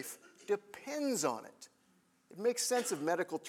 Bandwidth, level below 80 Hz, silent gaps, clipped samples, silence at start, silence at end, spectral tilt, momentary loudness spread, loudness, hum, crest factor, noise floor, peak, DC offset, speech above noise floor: 18 kHz; under -90 dBFS; none; under 0.1%; 0 s; 0 s; -2.5 dB/octave; 15 LU; -36 LUFS; none; 18 dB; -71 dBFS; -20 dBFS; under 0.1%; 36 dB